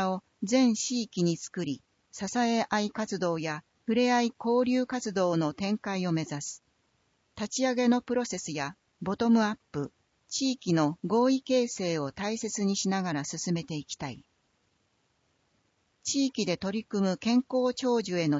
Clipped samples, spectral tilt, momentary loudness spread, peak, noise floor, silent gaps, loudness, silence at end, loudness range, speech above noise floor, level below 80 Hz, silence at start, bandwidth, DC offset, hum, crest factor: under 0.1%; -4.5 dB/octave; 12 LU; -12 dBFS; -73 dBFS; none; -29 LUFS; 0 s; 5 LU; 44 dB; -68 dBFS; 0 s; 8 kHz; under 0.1%; none; 16 dB